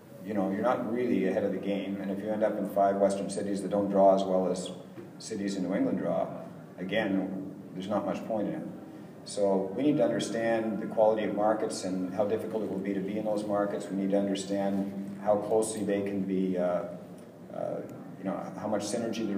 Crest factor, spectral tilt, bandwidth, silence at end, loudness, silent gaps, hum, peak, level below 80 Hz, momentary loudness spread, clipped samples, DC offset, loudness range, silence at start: 18 dB; -6 dB/octave; 15.5 kHz; 0 s; -30 LUFS; none; none; -12 dBFS; -76 dBFS; 13 LU; under 0.1%; under 0.1%; 5 LU; 0 s